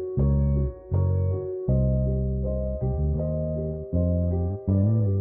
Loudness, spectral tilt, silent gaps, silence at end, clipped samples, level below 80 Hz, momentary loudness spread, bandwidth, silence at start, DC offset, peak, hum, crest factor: -26 LUFS; -16 dB/octave; none; 0 s; under 0.1%; -30 dBFS; 5 LU; 1.9 kHz; 0 s; under 0.1%; -12 dBFS; none; 12 dB